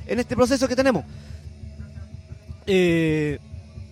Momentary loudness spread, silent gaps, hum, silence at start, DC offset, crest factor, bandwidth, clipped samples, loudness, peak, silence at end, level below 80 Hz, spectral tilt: 21 LU; none; none; 0 s; under 0.1%; 20 dB; 15 kHz; under 0.1%; -21 LUFS; -4 dBFS; 0.05 s; -44 dBFS; -6 dB/octave